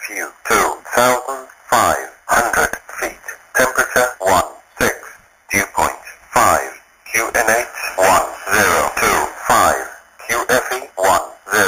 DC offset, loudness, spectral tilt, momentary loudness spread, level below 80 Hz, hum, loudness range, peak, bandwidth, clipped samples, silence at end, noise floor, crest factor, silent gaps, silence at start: under 0.1%; -16 LUFS; -2 dB/octave; 11 LU; -44 dBFS; none; 3 LU; 0 dBFS; 15.5 kHz; under 0.1%; 0 s; -40 dBFS; 18 dB; none; 0 s